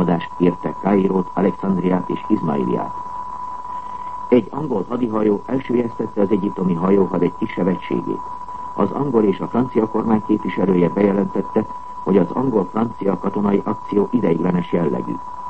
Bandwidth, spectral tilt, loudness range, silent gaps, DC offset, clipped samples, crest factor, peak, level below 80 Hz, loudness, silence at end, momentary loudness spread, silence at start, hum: 8 kHz; -9.5 dB/octave; 3 LU; none; 1%; under 0.1%; 18 dB; -2 dBFS; -50 dBFS; -20 LUFS; 0 s; 11 LU; 0 s; none